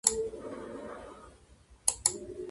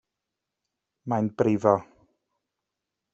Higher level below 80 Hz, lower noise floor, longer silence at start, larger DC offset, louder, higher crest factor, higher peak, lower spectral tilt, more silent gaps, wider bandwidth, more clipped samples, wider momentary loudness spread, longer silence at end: first, -58 dBFS vs -68 dBFS; second, -59 dBFS vs -85 dBFS; second, 0.05 s vs 1.05 s; neither; second, -33 LUFS vs -25 LUFS; first, 30 dB vs 24 dB; about the same, -6 dBFS vs -6 dBFS; second, -1 dB/octave vs -8.5 dB/octave; neither; first, 12 kHz vs 8 kHz; neither; first, 19 LU vs 8 LU; second, 0 s vs 1.3 s